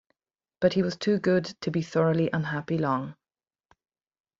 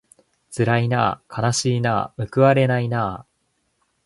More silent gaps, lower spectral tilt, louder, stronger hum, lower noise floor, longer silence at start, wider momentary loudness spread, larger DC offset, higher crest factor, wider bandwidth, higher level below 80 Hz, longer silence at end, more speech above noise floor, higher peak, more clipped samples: neither; first, -7 dB/octave vs -5.5 dB/octave; second, -27 LUFS vs -20 LUFS; neither; first, under -90 dBFS vs -70 dBFS; about the same, 0.6 s vs 0.5 s; second, 6 LU vs 9 LU; neither; about the same, 20 dB vs 20 dB; second, 7.6 kHz vs 11.5 kHz; second, -64 dBFS vs -52 dBFS; first, 1.25 s vs 0.85 s; first, over 64 dB vs 50 dB; second, -8 dBFS vs -2 dBFS; neither